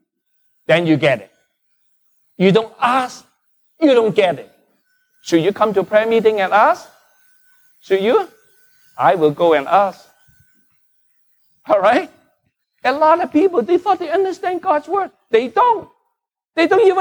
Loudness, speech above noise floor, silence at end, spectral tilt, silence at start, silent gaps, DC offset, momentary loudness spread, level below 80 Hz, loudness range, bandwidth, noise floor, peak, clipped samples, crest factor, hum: -16 LUFS; 59 dB; 0 s; -6 dB/octave; 0.7 s; none; under 0.1%; 8 LU; -66 dBFS; 3 LU; over 20 kHz; -74 dBFS; -2 dBFS; under 0.1%; 16 dB; none